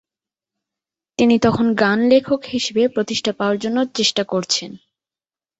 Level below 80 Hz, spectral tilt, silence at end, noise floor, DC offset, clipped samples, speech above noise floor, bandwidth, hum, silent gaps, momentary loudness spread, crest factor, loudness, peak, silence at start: -54 dBFS; -4 dB/octave; 0.85 s; under -90 dBFS; under 0.1%; under 0.1%; over 72 dB; 8.2 kHz; none; none; 6 LU; 18 dB; -18 LUFS; -2 dBFS; 1.2 s